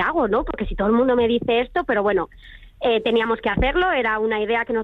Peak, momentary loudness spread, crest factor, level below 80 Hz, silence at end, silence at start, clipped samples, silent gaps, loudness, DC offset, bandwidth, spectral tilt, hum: -8 dBFS; 5 LU; 12 dB; -36 dBFS; 0 s; 0 s; under 0.1%; none; -20 LUFS; under 0.1%; 4.7 kHz; -7.5 dB/octave; none